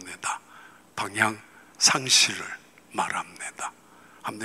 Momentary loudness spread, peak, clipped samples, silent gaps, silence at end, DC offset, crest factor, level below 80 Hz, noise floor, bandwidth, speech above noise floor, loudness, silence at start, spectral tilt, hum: 19 LU; -4 dBFS; under 0.1%; none; 0 s; under 0.1%; 24 dB; -74 dBFS; -51 dBFS; 16 kHz; 25 dB; -24 LUFS; 0 s; -0.5 dB/octave; 60 Hz at -60 dBFS